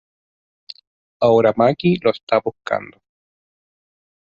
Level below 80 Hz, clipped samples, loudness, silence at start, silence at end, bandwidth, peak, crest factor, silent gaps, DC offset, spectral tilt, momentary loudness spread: -58 dBFS; under 0.1%; -18 LUFS; 1.2 s; 1.4 s; 7.4 kHz; -2 dBFS; 18 dB; 2.23-2.27 s; under 0.1%; -8 dB/octave; 11 LU